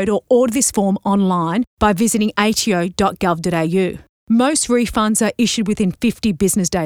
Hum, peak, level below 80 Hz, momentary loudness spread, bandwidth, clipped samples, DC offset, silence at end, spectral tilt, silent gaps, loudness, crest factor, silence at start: none; -2 dBFS; -42 dBFS; 4 LU; 17.5 kHz; under 0.1%; 0.1%; 0 s; -4.5 dB/octave; 1.67-1.77 s, 4.09-4.27 s; -17 LUFS; 16 dB; 0 s